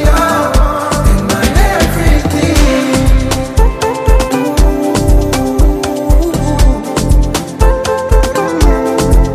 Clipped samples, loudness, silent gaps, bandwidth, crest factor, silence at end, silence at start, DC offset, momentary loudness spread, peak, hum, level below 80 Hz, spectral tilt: under 0.1%; -12 LUFS; none; 15.5 kHz; 10 dB; 0 s; 0 s; under 0.1%; 3 LU; 0 dBFS; none; -12 dBFS; -5.5 dB/octave